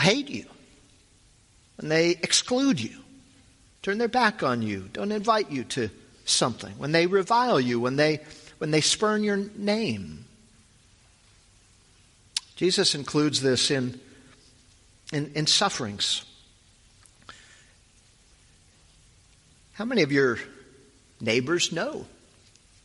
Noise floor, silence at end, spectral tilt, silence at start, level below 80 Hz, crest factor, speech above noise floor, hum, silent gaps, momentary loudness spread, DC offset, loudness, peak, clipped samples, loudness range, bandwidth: -59 dBFS; 0.8 s; -3.5 dB/octave; 0 s; -62 dBFS; 22 dB; 34 dB; none; none; 13 LU; under 0.1%; -25 LUFS; -6 dBFS; under 0.1%; 6 LU; 11.5 kHz